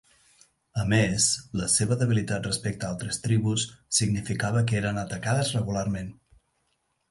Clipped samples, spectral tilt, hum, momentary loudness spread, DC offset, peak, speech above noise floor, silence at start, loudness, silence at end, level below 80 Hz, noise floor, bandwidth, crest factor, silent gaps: under 0.1%; -4 dB/octave; none; 8 LU; under 0.1%; -8 dBFS; 48 dB; 0.75 s; -26 LUFS; 1 s; -50 dBFS; -74 dBFS; 11.5 kHz; 18 dB; none